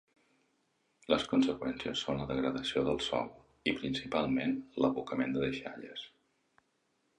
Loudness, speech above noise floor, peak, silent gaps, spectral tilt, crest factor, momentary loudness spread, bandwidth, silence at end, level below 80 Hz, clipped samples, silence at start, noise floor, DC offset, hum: -34 LUFS; 44 dB; -12 dBFS; none; -5.5 dB/octave; 22 dB; 13 LU; 10.5 kHz; 1.1 s; -60 dBFS; under 0.1%; 1.1 s; -77 dBFS; under 0.1%; none